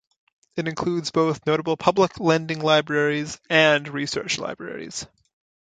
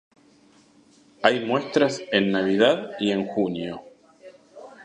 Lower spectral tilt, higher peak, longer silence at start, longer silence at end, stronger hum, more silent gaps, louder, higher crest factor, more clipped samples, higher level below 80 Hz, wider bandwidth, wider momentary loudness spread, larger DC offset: about the same, -4.5 dB/octave vs -5 dB/octave; about the same, -2 dBFS vs -2 dBFS; second, 0.55 s vs 1.2 s; first, 0.6 s vs 0 s; neither; neither; about the same, -22 LUFS vs -23 LUFS; about the same, 22 dB vs 24 dB; neither; first, -60 dBFS vs -66 dBFS; about the same, 9.4 kHz vs 10 kHz; first, 14 LU vs 8 LU; neither